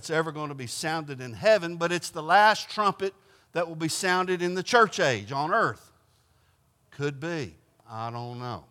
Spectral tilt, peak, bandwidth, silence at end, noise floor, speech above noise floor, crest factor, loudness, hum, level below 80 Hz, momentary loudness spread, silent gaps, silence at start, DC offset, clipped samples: -4 dB/octave; -6 dBFS; 16.5 kHz; 0.1 s; -66 dBFS; 39 dB; 22 dB; -26 LUFS; none; -72 dBFS; 15 LU; none; 0 s; under 0.1%; under 0.1%